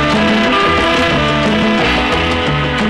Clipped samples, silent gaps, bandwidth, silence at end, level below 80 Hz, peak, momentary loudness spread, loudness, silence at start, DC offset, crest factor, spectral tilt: under 0.1%; none; 12.5 kHz; 0 s; -28 dBFS; -2 dBFS; 3 LU; -12 LUFS; 0 s; 0.5%; 10 dB; -5 dB/octave